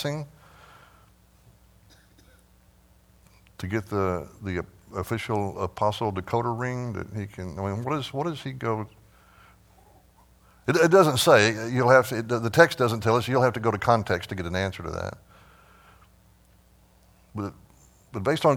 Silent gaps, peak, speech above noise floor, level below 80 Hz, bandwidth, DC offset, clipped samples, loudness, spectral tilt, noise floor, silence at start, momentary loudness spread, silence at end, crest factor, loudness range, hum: none; -2 dBFS; 34 dB; -56 dBFS; 18 kHz; under 0.1%; under 0.1%; -25 LUFS; -5.5 dB/octave; -58 dBFS; 0 s; 17 LU; 0 s; 24 dB; 15 LU; none